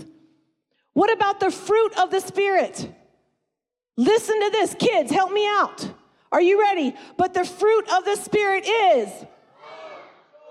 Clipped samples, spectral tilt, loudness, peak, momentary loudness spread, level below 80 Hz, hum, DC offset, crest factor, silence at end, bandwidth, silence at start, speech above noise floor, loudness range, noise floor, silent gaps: under 0.1%; -3.5 dB/octave; -21 LUFS; -10 dBFS; 17 LU; -68 dBFS; none; under 0.1%; 12 dB; 0.5 s; 13.5 kHz; 0 s; 64 dB; 2 LU; -84 dBFS; none